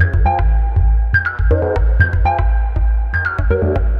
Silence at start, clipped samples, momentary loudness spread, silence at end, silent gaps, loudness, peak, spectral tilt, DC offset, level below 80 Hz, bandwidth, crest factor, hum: 0 s; under 0.1%; 3 LU; 0 s; none; -16 LUFS; 0 dBFS; -9.5 dB/octave; under 0.1%; -16 dBFS; 5 kHz; 14 dB; none